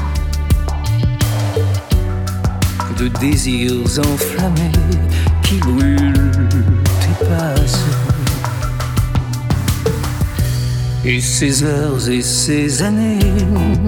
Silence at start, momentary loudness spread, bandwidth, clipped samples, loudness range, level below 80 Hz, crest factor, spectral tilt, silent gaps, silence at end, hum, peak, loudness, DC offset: 0 s; 5 LU; 19.5 kHz; under 0.1%; 3 LU; -22 dBFS; 14 dB; -5.5 dB/octave; none; 0 s; none; 0 dBFS; -16 LUFS; under 0.1%